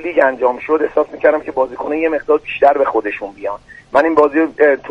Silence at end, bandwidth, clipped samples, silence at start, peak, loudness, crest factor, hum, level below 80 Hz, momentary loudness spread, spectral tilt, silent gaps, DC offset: 0 s; 7 kHz; under 0.1%; 0 s; 0 dBFS; -15 LUFS; 14 dB; none; -50 dBFS; 11 LU; -6 dB/octave; none; under 0.1%